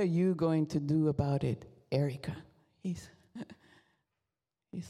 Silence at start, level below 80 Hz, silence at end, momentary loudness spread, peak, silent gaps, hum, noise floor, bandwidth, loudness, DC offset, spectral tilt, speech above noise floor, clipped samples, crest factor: 0 s; -62 dBFS; 0 s; 19 LU; -16 dBFS; none; none; -90 dBFS; 12 kHz; -33 LUFS; under 0.1%; -8.5 dB/octave; 58 dB; under 0.1%; 18 dB